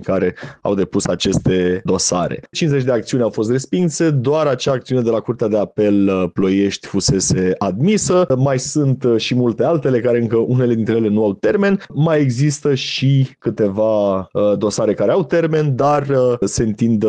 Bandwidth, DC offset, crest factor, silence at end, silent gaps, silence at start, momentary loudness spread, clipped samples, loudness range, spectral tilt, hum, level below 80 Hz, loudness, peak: 10 kHz; under 0.1%; 10 dB; 0 s; none; 0 s; 4 LU; under 0.1%; 1 LU; -5.5 dB/octave; none; -46 dBFS; -17 LUFS; -6 dBFS